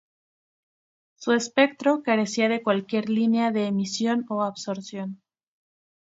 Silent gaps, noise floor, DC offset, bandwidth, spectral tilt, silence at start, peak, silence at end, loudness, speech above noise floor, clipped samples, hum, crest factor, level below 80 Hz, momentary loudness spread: none; under -90 dBFS; under 0.1%; 8 kHz; -5 dB/octave; 1.2 s; -4 dBFS; 1 s; -24 LUFS; over 66 dB; under 0.1%; none; 22 dB; -74 dBFS; 12 LU